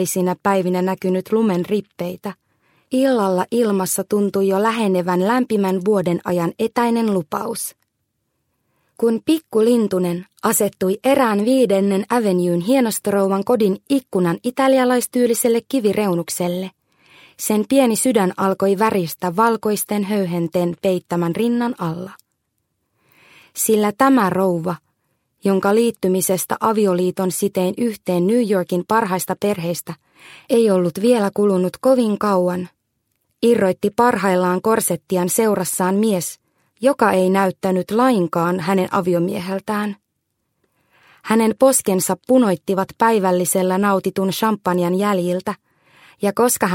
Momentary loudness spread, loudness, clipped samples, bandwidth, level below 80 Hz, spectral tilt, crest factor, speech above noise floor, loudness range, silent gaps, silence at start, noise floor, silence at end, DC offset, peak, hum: 8 LU; -18 LUFS; under 0.1%; 16.5 kHz; -62 dBFS; -5 dB/octave; 18 dB; 56 dB; 3 LU; none; 0 s; -73 dBFS; 0 s; under 0.1%; 0 dBFS; none